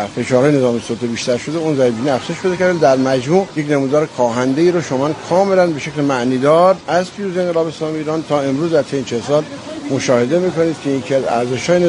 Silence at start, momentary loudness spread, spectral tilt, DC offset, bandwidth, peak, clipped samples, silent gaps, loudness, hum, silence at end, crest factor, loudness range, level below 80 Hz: 0 s; 7 LU; -6 dB/octave; under 0.1%; 10.5 kHz; 0 dBFS; under 0.1%; none; -16 LUFS; none; 0 s; 14 dB; 3 LU; -54 dBFS